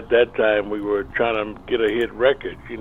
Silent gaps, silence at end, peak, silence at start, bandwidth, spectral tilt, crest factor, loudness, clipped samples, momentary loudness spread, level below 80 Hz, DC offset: none; 0 s; -4 dBFS; 0 s; 7.6 kHz; -6.5 dB/octave; 16 dB; -21 LUFS; under 0.1%; 7 LU; -44 dBFS; under 0.1%